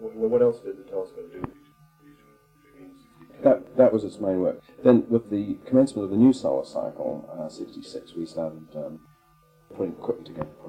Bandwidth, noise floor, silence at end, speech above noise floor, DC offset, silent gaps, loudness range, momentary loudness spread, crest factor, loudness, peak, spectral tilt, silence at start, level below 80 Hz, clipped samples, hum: 9.8 kHz; -59 dBFS; 0 s; 35 dB; under 0.1%; none; 13 LU; 18 LU; 22 dB; -24 LUFS; -4 dBFS; -8 dB/octave; 0 s; -60 dBFS; under 0.1%; none